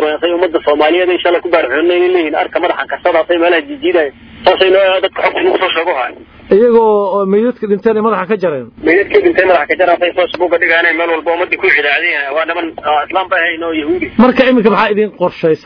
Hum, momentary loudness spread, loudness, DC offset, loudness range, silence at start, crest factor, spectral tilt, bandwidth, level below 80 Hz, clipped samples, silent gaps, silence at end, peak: none; 6 LU; -11 LUFS; under 0.1%; 1 LU; 0 s; 12 dB; -7 dB/octave; 5.4 kHz; -46 dBFS; 0.2%; none; 0.1 s; 0 dBFS